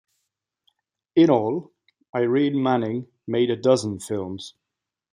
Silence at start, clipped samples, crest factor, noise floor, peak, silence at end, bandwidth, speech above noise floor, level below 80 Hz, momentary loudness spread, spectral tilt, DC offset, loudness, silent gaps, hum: 1.15 s; under 0.1%; 20 dB; -85 dBFS; -4 dBFS; 0.65 s; 13 kHz; 64 dB; -68 dBFS; 13 LU; -6.5 dB/octave; under 0.1%; -22 LUFS; 2.09-2.13 s; none